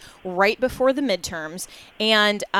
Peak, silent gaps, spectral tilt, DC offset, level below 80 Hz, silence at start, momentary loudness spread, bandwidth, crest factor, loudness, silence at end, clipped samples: -6 dBFS; none; -3 dB/octave; under 0.1%; -52 dBFS; 0 s; 15 LU; 16.5 kHz; 18 dB; -21 LUFS; 0 s; under 0.1%